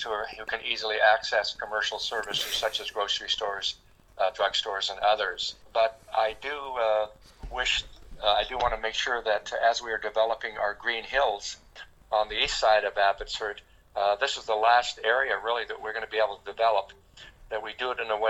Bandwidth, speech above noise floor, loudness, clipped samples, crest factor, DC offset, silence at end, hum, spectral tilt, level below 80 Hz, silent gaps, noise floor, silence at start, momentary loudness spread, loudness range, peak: 17.5 kHz; 22 dB; -27 LUFS; under 0.1%; 20 dB; under 0.1%; 0 s; none; -1 dB/octave; -52 dBFS; none; -49 dBFS; 0 s; 10 LU; 3 LU; -8 dBFS